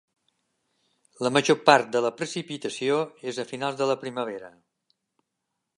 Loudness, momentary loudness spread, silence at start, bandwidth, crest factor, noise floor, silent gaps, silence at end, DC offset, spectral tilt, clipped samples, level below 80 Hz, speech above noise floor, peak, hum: -25 LUFS; 14 LU; 1.2 s; 11.5 kHz; 26 dB; -82 dBFS; none; 1.3 s; under 0.1%; -4 dB/octave; under 0.1%; -78 dBFS; 57 dB; -2 dBFS; none